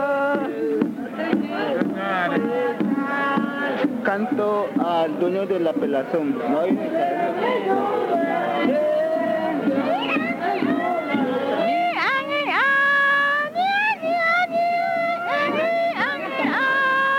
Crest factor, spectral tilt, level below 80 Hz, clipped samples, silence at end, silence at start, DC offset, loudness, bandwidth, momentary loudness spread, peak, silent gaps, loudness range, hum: 16 dB; -6 dB/octave; -72 dBFS; under 0.1%; 0 s; 0 s; under 0.1%; -21 LUFS; 16.5 kHz; 5 LU; -6 dBFS; none; 3 LU; none